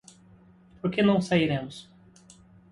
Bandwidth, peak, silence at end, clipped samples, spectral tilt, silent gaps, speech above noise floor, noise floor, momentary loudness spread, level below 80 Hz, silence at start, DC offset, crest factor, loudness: 11.5 kHz; -10 dBFS; 0.9 s; under 0.1%; -6.5 dB/octave; none; 31 dB; -55 dBFS; 17 LU; -60 dBFS; 0.85 s; under 0.1%; 20 dB; -25 LUFS